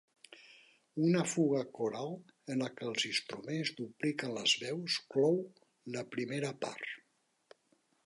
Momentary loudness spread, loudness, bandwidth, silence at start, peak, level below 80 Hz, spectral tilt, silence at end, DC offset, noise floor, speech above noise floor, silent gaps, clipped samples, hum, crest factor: 16 LU; -35 LUFS; 11.5 kHz; 0.3 s; -16 dBFS; -84 dBFS; -4 dB/octave; 1.1 s; under 0.1%; -77 dBFS; 41 dB; none; under 0.1%; none; 20 dB